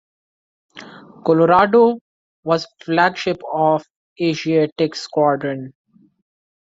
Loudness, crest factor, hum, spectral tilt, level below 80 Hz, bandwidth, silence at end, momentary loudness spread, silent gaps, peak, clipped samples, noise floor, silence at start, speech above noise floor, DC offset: -18 LUFS; 18 dB; none; -6 dB/octave; -60 dBFS; 7.8 kHz; 1.05 s; 17 LU; 2.01-2.43 s, 3.90-4.16 s, 4.72-4.76 s; -2 dBFS; under 0.1%; -40 dBFS; 0.75 s; 23 dB; under 0.1%